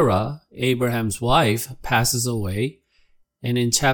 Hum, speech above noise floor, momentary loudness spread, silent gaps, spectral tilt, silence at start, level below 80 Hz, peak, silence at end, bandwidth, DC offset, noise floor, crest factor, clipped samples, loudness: none; 38 dB; 8 LU; none; -4 dB/octave; 0 s; -42 dBFS; -4 dBFS; 0 s; 18 kHz; under 0.1%; -59 dBFS; 18 dB; under 0.1%; -22 LUFS